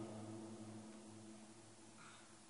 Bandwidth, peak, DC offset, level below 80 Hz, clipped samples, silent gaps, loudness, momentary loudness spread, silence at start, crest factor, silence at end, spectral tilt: 10.5 kHz; -40 dBFS; under 0.1%; -84 dBFS; under 0.1%; none; -56 LUFS; 8 LU; 0 s; 16 dB; 0 s; -5 dB/octave